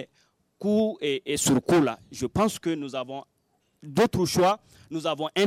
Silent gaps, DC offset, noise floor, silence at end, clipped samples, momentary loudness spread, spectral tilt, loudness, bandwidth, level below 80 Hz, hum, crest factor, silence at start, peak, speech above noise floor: none; under 0.1%; -71 dBFS; 0 s; under 0.1%; 11 LU; -4.5 dB/octave; -26 LUFS; 16 kHz; -56 dBFS; none; 14 dB; 0 s; -12 dBFS; 45 dB